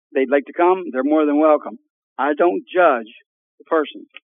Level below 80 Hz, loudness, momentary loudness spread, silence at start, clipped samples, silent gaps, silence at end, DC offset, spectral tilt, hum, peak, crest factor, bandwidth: under -90 dBFS; -18 LUFS; 8 LU; 0.15 s; under 0.1%; 1.90-2.16 s, 3.26-3.58 s; 0.25 s; under 0.1%; -8.5 dB/octave; none; -2 dBFS; 16 dB; 3.8 kHz